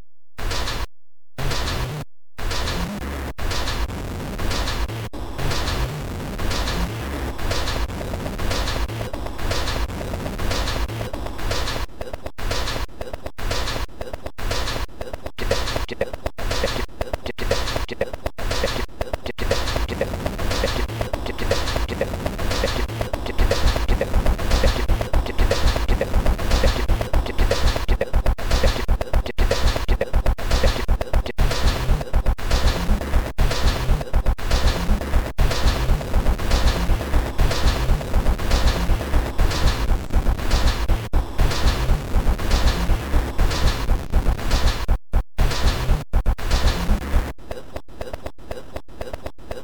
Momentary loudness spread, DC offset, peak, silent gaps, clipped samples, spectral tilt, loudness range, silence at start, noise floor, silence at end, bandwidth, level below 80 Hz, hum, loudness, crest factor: 9 LU; 2%; -4 dBFS; none; under 0.1%; -5 dB/octave; 5 LU; 0 s; -88 dBFS; 0 s; over 20 kHz; -22 dBFS; none; -24 LUFS; 16 dB